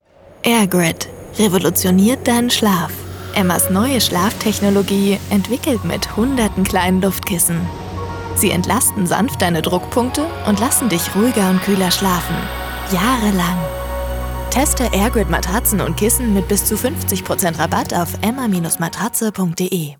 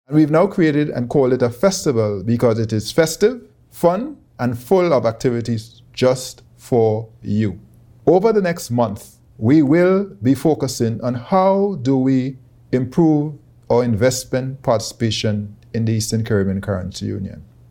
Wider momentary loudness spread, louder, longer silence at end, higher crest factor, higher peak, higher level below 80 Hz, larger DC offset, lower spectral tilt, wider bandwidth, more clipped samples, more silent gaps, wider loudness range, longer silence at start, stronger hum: about the same, 8 LU vs 10 LU; about the same, -16 LUFS vs -18 LUFS; second, 0.05 s vs 0.3 s; about the same, 16 dB vs 16 dB; about the same, -2 dBFS vs -2 dBFS; first, -32 dBFS vs -48 dBFS; neither; second, -4 dB/octave vs -6.5 dB/octave; first, over 20 kHz vs 18 kHz; neither; neither; about the same, 2 LU vs 3 LU; first, 0.45 s vs 0.1 s; neither